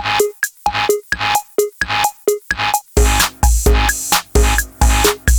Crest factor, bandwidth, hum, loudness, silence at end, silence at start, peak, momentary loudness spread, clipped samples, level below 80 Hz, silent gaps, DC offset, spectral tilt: 12 dB; over 20 kHz; none; -15 LUFS; 0 s; 0 s; -4 dBFS; 5 LU; under 0.1%; -18 dBFS; none; under 0.1%; -3 dB/octave